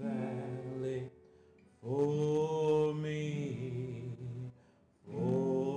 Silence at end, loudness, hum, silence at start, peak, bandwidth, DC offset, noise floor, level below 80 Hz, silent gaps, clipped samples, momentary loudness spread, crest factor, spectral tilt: 0 s; -36 LUFS; none; 0 s; -20 dBFS; 10 kHz; under 0.1%; -65 dBFS; -72 dBFS; none; under 0.1%; 14 LU; 16 dB; -8 dB/octave